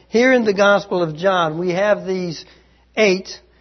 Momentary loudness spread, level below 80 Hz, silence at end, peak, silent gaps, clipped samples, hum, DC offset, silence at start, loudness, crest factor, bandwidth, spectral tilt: 14 LU; -56 dBFS; 0.25 s; -2 dBFS; none; under 0.1%; none; under 0.1%; 0.15 s; -17 LUFS; 16 dB; 6.4 kHz; -5 dB/octave